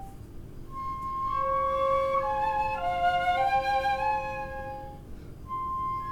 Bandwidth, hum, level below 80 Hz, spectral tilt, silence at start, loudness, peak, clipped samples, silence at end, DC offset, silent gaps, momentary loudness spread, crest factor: 19 kHz; none; -46 dBFS; -5 dB/octave; 0 s; -28 LUFS; -16 dBFS; under 0.1%; 0 s; under 0.1%; none; 20 LU; 14 dB